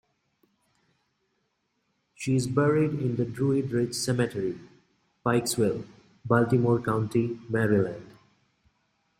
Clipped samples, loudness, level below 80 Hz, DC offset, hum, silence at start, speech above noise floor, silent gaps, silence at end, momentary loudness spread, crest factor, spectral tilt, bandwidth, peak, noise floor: under 0.1%; -27 LUFS; -62 dBFS; under 0.1%; none; 2.2 s; 50 dB; none; 1.1 s; 11 LU; 22 dB; -6 dB/octave; 16 kHz; -6 dBFS; -76 dBFS